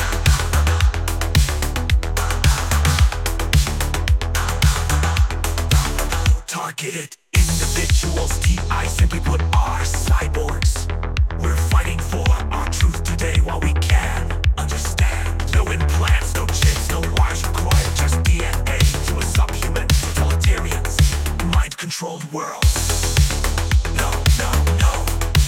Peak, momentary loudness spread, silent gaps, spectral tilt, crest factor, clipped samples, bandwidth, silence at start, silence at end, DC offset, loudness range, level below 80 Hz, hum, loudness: -2 dBFS; 5 LU; none; -4 dB/octave; 14 dB; under 0.1%; 17 kHz; 0 s; 0 s; under 0.1%; 1 LU; -20 dBFS; none; -19 LUFS